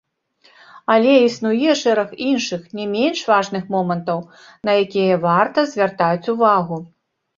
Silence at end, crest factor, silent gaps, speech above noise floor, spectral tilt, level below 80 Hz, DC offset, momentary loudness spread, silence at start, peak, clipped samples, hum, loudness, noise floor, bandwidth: 0.5 s; 16 dB; none; 39 dB; -5.5 dB/octave; -64 dBFS; under 0.1%; 10 LU; 0.75 s; -2 dBFS; under 0.1%; none; -18 LUFS; -56 dBFS; 7.6 kHz